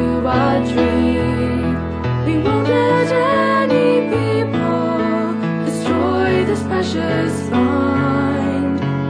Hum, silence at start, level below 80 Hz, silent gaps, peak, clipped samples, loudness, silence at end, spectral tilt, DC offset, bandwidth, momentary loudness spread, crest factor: none; 0 s; -38 dBFS; none; -2 dBFS; under 0.1%; -17 LUFS; 0 s; -7 dB/octave; under 0.1%; 11 kHz; 5 LU; 14 dB